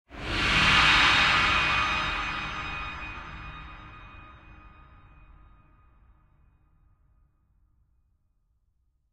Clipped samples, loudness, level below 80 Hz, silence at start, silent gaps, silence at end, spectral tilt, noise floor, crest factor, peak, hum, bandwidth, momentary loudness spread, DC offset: under 0.1%; -22 LUFS; -44 dBFS; 0.1 s; none; 4.45 s; -2.5 dB/octave; -71 dBFS; 22 dB; -8 dBFS; none; 13 kHz; 25 LU; under 0.1%